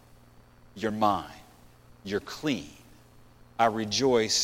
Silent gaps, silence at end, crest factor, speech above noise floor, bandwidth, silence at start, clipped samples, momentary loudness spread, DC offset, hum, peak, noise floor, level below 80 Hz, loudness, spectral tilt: none; 0 s; 22 dB; 28 dB; 16.5 kHz; 0.75 s; under 0.1%; 20 LU; under 0.1%; 60 Hz at -60 dBFS; -8 dBFS; -55 dBFS; -58 dBFS; -28 LUFS; -3.5 dB/octave